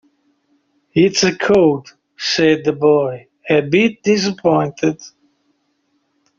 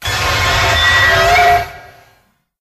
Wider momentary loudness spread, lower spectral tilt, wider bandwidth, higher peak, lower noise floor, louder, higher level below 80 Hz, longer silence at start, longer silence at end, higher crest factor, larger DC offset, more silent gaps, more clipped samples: first, 10 LU vs 6 LU; first, -4 dB/octave vs -2.5 dB/octave; second, 7.6 kHz vs 15.5 kHz; about the same, -2 dBFS vs 0 dBFS; first, -65 dBFS vs -55 dBFS; second, -16 LUFS vs -10 LUFS; second, -56 dBFS vs -28 dBFS; first, 0.95 s vs 0 s; first, 1.3 s vs 0.75 s; about the same, 16 dB vs 14 dB; neither; neither; neither